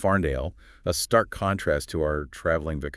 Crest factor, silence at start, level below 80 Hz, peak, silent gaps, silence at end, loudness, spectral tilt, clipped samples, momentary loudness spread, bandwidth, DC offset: 20 dB; 0 s; -40 dBFS; -6 dBFS; none; 0 s; -26 LUFS; -5 dB/octave; under 0.1%; 8 LU; 12 kHz; under 0.1%